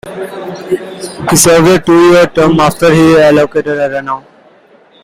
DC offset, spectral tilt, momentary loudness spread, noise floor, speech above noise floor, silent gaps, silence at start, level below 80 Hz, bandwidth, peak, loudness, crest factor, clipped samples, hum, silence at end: under 0.1%; -4.5 dB/octave; 16 LU; -43 dBFS; 35 dB; none; 0.05 s; -38 dBFS; over 20 kHz; 0 dBFS; -8 LUFS; 10 dB; 0.1%; none; 0.85 s